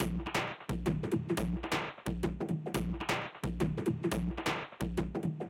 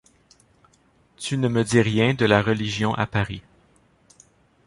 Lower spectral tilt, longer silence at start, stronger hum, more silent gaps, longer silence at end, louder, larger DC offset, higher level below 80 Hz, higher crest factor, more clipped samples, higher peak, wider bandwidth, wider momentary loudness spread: about the same, -6 dB/octave vs -5.5 dB/octave; second, 0 s vs 1.2 s; neither; neither; second, 0 s vs 1.25 s; second, -35 LUFS vs -22 LUFS; neither; about the same, -46 dBFS vs -50 dBFS; about the same, 16 dB vs 20 dB; neither; second, -18 dBFS vs -4 dBFS; first, 16.5 kHz vs 11.5 kHz; second, 4 LU vs 11 LU